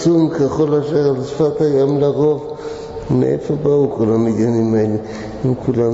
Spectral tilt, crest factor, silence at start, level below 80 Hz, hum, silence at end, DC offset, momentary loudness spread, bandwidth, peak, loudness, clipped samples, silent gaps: -8.5 dB/octave; 12 dB; 0 s; -44 dBFS; none; 0 s; under 0.1%; 9 LU; 8 kHz; -4 dBFS; -16 LUFS; under 0.1%; none